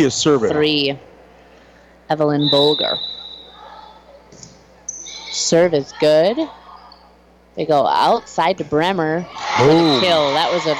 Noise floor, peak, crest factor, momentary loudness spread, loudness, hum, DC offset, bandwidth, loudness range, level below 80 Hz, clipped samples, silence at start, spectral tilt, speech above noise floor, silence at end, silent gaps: -49 dBFS; -4 dBFS; 14 dB; 16 LU; -16 LUFS; none; under 0.1%; 13 kHz; 5 LU; -54 dBFS; under 0.1%; 0 s; -4 dB/octave; 33 dB; 0 s; none